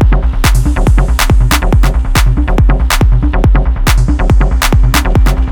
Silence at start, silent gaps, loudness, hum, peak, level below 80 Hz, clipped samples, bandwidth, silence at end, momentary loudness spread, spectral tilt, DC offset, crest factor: 0 s; none; -11 LUFS; none; 0 dBFS; -8 dBFS; under 0.1%; 19 kHz; 0 s; 2 LU; -5 dB/octave; under 0.1%; 8 dB